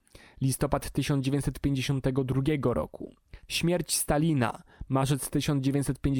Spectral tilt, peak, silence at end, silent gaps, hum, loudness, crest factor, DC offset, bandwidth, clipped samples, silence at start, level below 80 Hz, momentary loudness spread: -5.5 dB/octave; -10 dBFS; 0 s; none; none; -28 LUFS; 18 dB; under 0.1%; 18 kHz; under 0.1%; 0.4 s; -44 dBFS; 6 LU